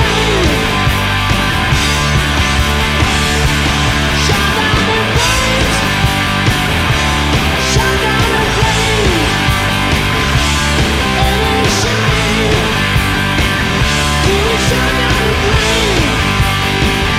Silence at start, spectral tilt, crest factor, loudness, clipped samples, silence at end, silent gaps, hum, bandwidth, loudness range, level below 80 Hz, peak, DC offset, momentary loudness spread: 0 s; -4 dB/octave; 12 dB; -12 LUFS; under 0.1%; 0 s; none; none; 16 kHz; 0 LU; -20 dBFS; 0 dBFS; under 0.1%; 1 LU